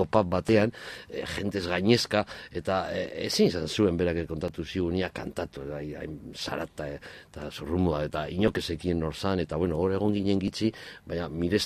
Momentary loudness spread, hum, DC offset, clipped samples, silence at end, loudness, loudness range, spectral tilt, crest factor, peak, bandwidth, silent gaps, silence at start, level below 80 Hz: 13 LU; none; under 0.1%; under 0.1%; 0 s; -29 LUFS; 6 LU; -5.5 dB/octave; 22 dB; -6 dBFS; 15 kHz; none; 0 s; -46 dBFS